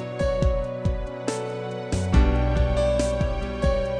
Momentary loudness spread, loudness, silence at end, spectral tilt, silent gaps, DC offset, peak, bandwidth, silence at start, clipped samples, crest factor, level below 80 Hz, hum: 8 LU; -25 LUFS; 0 s; -6.5 dB/octave; none; under 0.1%; -8 dBFS; 10 kHz; 0 s; under 0.1%; 16 dB; -26 dBFS; none